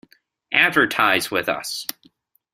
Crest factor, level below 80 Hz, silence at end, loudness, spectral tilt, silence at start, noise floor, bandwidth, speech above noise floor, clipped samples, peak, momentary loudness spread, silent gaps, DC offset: 20 dB; -62 dBFS; 0.7 s; -19 LUFS; -2.5 dB/octave; 0.5 s; -58 dBFS; 16 kHz; 38 dB; under 0.1%; -2 dBFS; 12 LU; none; under 0.1%